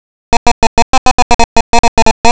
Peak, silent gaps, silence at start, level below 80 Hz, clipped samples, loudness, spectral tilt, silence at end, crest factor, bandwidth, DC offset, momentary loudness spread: 0 dBFS; 0.37-0.46 s, 0.52-1.73 s, 1.79-2.24 s; 0.3 s; -32 dBFS; 20%; -11 LUFS; -3 dB/octave; 0 s; 6 dB; 8 kHz; under 0.1%; 2 LU